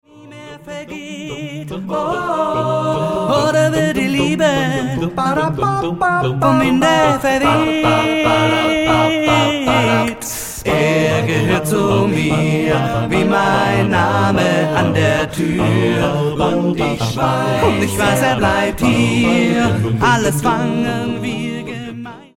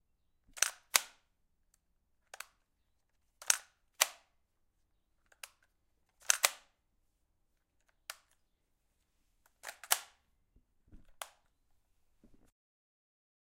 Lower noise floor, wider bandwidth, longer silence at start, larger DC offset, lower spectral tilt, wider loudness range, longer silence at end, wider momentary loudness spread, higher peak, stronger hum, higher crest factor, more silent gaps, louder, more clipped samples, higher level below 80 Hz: second, -36 dBFS vs -79 dBFS; about the same, 17 kHz vs 16 kHz; second, 0.15 s vs 0.55 s; first, 0.4% vs under 0.1%; first, -5.5 dB/octave vs 3 dB/octave; second, 3 LU vs 6 LU; second, 0.15 s vs 2.25 s; second, 9 LU vs 23 LU; first, 0 dBFS vs -4 dBFS; neither; second, 14 dB vs 38 dB; neither; first, -15 LUFS vs -33 LUFS; neither; first, -40 dBFS vs -74 dBFS